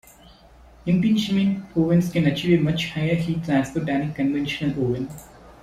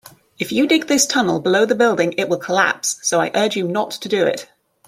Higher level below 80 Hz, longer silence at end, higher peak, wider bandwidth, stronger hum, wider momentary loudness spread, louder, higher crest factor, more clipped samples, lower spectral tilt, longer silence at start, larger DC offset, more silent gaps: first, -50 dBFS vs -64 dBFS; second, 0.1 s vs 0.45 s; second, -6 dBFS vs 0 dBFS; second, 14.5 kHz vs 16.5 kHz; neither; about the same, 6 LU vs 7 LU; second, -22 LUFS vs -17 LUFS; about the same, 16 dB vs 18 dB; neither; first, -7 dB/octave vs -3 dB/octave; first, 0.85 s vs 0.4 s; neither; neither